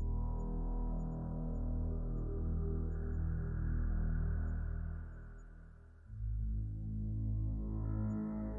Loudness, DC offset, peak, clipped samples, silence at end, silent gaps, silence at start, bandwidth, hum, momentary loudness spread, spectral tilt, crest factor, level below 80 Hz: -40 LUFS; under 0.1%; -28 dBFS; under 0.1%; 0 s; none; 0 s; 2.1 kHz; none; 13 LU; -12 dB/octave; 10 dB; -40 dBFS